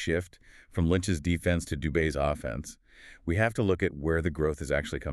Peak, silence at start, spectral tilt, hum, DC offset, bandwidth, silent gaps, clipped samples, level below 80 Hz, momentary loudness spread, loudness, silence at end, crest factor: -12 dBFS; 0 s; -6 dB/octave; none; under 0.1%; 13 kHz; none; under 0.1%; -42 dBFS; 11 LU; -29 LUFS; 0 s; 18 dB